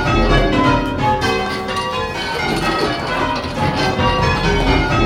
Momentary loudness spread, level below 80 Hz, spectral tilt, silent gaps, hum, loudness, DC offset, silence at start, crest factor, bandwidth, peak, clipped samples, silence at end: 6 LU; -26 dBFS; -5.5 dB/octave; none; none; -17 LUFS; under 0.1%; 0 s; 16 dB; 15 kHz; 0 dBFS; under 0.1%; 0 s